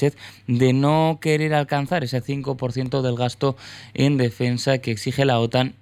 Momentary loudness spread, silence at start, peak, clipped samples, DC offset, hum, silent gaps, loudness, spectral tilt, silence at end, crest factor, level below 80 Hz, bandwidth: 7 LU; 0 s; -6 dBFS; under 0.1%; under 0.1%; none; none; -21 LUFS; -6.5 dB/octave; 0.1 s; 16 dB; -54 dBFS; 15 kHz